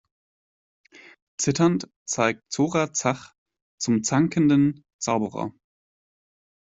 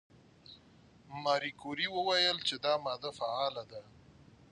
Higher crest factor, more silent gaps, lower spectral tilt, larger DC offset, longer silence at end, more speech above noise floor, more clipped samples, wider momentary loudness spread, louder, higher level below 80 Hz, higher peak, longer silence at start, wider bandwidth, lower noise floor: about the same, 20 dB vs 20 dB; first, 1.96-2.06 s, 3.38-3.46 s, 3.62-3.78 s, 4.93-4.99 s vs none; first, -5 dB/octave vs -3 dB/octave; neither; first, 1.1 s vs 0.55 s; first, over 67 dB vs 27 dB; neither; second, 12 LU vs 20 LU; first, -24 LUFS vs -33 LUFS; first, -62 dBFS vs -72 dBFS; first, -4 dBFS vs -16 dBFS; first, 1.4 s vs 0.5 s; second, 8 kHz vs 11 kHz; first, under -90 dBFS vs -61 dBFS